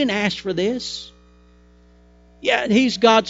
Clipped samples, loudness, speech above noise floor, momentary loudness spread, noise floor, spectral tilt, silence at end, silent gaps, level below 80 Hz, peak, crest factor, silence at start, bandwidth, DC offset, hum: under 0.1%; -20 LUFS; 32 dB; 15 LU; -51 dBFS; -4.5 dB/octave; 0 s; none; -52 dBFS; -2 dBFS; 20 dB; 0 s; 8 kHz; under 0.1%; 60 Hz at -50 dBFS